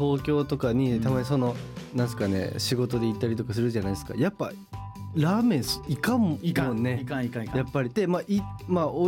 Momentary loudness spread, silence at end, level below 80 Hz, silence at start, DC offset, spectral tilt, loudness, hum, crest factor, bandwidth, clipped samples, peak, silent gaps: 6 LU; 0 s; -50 dBFS; 0 s; under 0.1%; -6.5 dB/octave; -27 LUFS; none; 12 dB; 17 kHz; under 0.1%; -14 dBFS; none